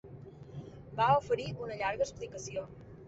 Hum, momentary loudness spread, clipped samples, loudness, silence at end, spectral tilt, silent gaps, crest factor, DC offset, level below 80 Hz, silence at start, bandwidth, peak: none; 20 LU; under 0.1%; -33 LUFS; 0 s; -5 dB/octave; none; 20 dB; under 0.1%; -60 dBFS; 0.05 s; 8 kHz; -14 dBFS